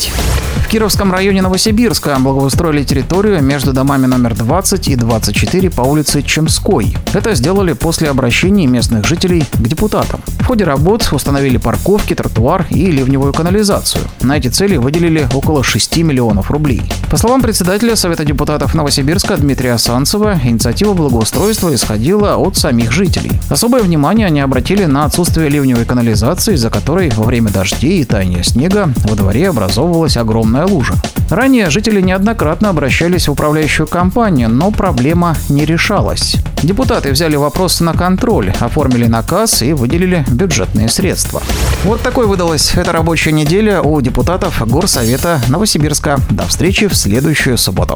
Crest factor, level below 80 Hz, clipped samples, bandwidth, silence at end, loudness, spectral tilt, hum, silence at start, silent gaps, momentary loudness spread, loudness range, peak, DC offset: 10 dB; -22 dBFS; under 0.1%; over 20 kHz; 0 s; -11 LUFS; -5 dB/octave; none; 0 s; none; 3 LU; 1 LU; 0 dBFS; under 0.1%